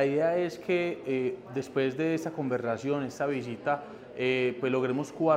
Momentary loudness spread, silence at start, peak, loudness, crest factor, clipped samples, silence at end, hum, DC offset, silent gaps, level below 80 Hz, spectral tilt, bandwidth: 5 LU; 0 s; -12 dBFS; -30 LUFS; 18 dB; under 0.1%; 0 s; none; under 0.1%; none; -72 dBFS; -6.5 dB/octave; 15 kHz